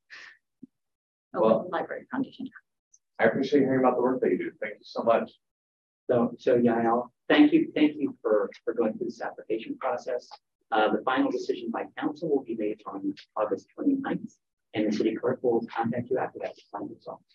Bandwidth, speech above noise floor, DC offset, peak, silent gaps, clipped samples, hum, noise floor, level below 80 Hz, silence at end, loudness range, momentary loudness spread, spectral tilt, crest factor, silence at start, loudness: 7.2 kHz; 28 dB; under 0.1%; -8 dBFS; 0.95-1.31 s, 2.79-2.91 s, 5.51-6.07 s, 10.55-10.59 s, 14.53-14.57 s; under 0.1%; none; -55 dBFS; -78 dBFS; 0.2 s; 5 LU; 14 LU; -7 dB/octave; 20 dB; 0.1 s; -27 LUFS